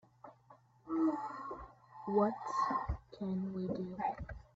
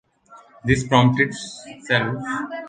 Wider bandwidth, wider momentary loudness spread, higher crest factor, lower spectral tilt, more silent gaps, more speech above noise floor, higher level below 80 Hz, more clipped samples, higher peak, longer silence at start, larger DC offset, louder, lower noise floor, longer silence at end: second, 7.8 kHz vs 9.6 kHz; about the same, 18 LU vs 17 LU; about the same, 18 dB vs 20 dB; first, -8 dB/octave vs -5.5 dB/octave; neither; about the same, 28 dB vs 29 dB; second, -54 dBFS vs -46 dBFS; neither; second, -20 dBFS vs -2 dBFS; about the same, 0.25 s vs 0.3 s; neither; second, -38 LUFS vs -20 LUFS; first, -64 dBFS vs -49 dBFS; first, 0.15 s vs 0 s